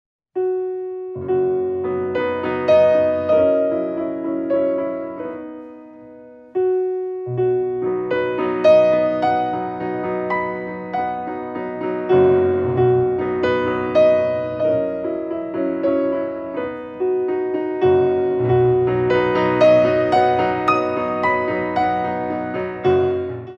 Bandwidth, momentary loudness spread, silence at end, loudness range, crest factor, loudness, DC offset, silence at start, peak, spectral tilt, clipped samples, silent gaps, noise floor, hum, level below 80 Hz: 6.8 kHz; 11 LU; 0 s; 6 LU; 16 dB; -19 LUFS; under 0.1%; 0.35 s; -4 dBFS; -8 dB/octave; under 0.1%; none; -41 dBFS; none; -52 dBFS